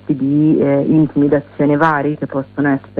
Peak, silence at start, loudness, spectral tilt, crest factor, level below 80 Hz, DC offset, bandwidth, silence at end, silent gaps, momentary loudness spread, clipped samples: -2 dBFS; 0.1 s; -15 LUFS; -10.5 dB/octave; 12 dB; -50 dBFS; under 0.1%; 4.5 kHz; 0 s; none; 6 LU; under 0.1%